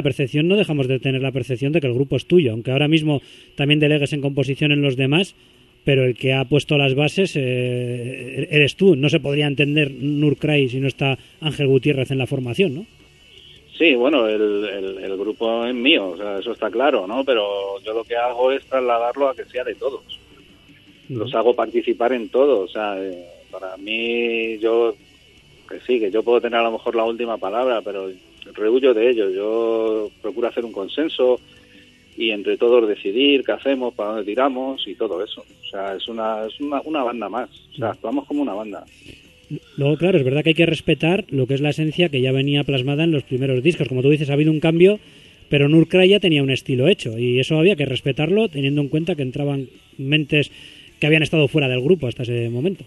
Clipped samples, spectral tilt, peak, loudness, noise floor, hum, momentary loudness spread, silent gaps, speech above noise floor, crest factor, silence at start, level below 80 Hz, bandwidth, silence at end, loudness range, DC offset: under 0.1%; -7 dB/octave; 0 dBFS; -19 LUFS; -50 dBFS; none; 11 LU; none; 31 dB; 18 dB; 0 s; -54 dBFS; 12 kHz; 0 s; 6 LU; under 0.1%